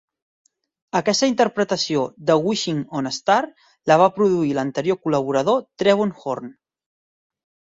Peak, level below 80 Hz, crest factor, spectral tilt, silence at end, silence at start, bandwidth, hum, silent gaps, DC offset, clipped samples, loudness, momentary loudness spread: -2 dBFS; -64 dBFS; 18 dB; -4.5 dB/octave; 1.2 s; 0.95 s; 7.8 kHz; none; none; under 0.1%; under 0.1%; -20 LUFS; 10 LU